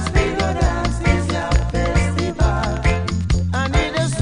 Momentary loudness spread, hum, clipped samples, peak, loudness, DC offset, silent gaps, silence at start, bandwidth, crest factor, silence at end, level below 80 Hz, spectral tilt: 2 LU; none; under 0.1%; -2 dBFS; -19 LUFS; under 0.1%; none; 0 s; 10.5 kHz; 16 dB; 0 s; -22 dBFS; -5.5 dB/octave